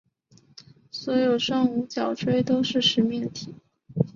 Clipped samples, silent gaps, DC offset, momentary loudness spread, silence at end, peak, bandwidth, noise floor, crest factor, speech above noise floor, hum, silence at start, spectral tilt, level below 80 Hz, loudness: under 0.1%; none; under 0.1%; 16 LU; 0.05 s; -6 dBFS; 7.4 kHz; -58 dBFS; 20 dB; 35 dB; none; 0.95 s; -5.5 dB/octave; -62 dBFS; -24 LUFS